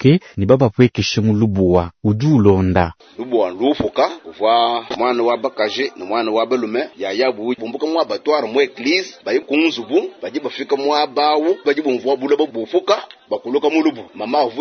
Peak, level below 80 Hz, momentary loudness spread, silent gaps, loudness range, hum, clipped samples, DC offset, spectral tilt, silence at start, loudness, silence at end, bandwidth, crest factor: 0 dBFS; -48 dBFS; 8 LU; none; 3 LU; none; under 0.1%; under 0.1%; -6.5 dB/octave; 0 s; -17 LUFS; 0 s; 6.6 kHz; 16 dB